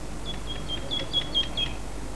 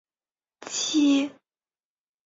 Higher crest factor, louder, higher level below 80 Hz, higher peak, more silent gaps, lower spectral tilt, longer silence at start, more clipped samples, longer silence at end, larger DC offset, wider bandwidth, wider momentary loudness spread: about the same, 16 dB vs 16 dB; second, -29 LUFS vs -24 LUFS; first, -38 dBFS vs -74 dBFS; about the same, -14 dBFS vs -12 dBFS; neither; first, -3.5 dB/octave vs -1.5 dB/octave; second, 0 s vs 0.6 s; neither; second, 0 s vs 0.95 s; first, 2% vs under 0.1%; first, 11 kHz vs 7.8 kHz; second, 11 LU vs 14 LU